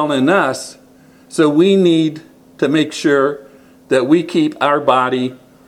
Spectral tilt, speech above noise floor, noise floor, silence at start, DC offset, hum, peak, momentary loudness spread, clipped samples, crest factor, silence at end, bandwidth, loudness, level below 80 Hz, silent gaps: -5.5 dB/octave; 32 dB; -45 dBFS; 0 s; under 0.1%; none; 0 dBFS; 13 LU; under 0.1%; 16 dB; 0.3 s; 12.5 kHz; -15 LUFS; -62 dBFS; none